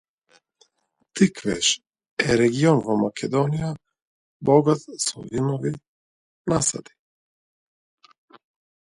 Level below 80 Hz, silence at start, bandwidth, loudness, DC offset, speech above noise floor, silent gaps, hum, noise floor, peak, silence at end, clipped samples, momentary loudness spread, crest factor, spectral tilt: -56 dBFS; 1.15 s; 11.5 kHz; -22 LUFS; under 0.1%; 50 dB; 2.11-2.17 s, 4.02-4.40 s, 5.88-6.45 s; none; -71 dBFS; -4 dBFS; 2.1 s; under 0.1%; 15 LU; 22 dB; -4.5 dB/octave